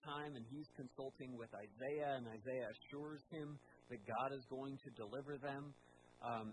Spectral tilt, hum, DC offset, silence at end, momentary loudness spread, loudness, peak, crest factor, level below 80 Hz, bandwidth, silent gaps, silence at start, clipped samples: -7 dB/octave; none; under 0.1%; 0 s; 10 LU; -49 LUFS; -30 dBFS; 18 dB; -84 dBFS; 10 kHz; none; 0.05 s; under 0.1%